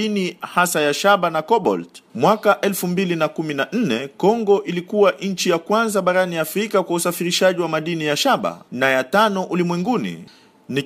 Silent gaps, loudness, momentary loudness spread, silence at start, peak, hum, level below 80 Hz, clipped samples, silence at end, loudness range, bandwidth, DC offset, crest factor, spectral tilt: none; -19 LUFS; 6 LU; 0 s; -2 dBFS; none; -66 dBFS; under 0.1%; 0 s; 1 LU; 15.5 kHz; under 0.1%; 18 dB; -4.5 dB/octave